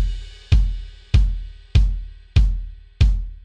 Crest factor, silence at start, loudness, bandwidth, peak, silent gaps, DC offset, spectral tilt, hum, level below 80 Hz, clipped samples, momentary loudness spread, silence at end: 14 dB; 0 s; -22 LUFS; 7.4 kHz; -4 dBFS; none; under 0.1%; -6.5 dB/octave; none; -20 dBFS; under 0.1%; 14 LU; 0.05 s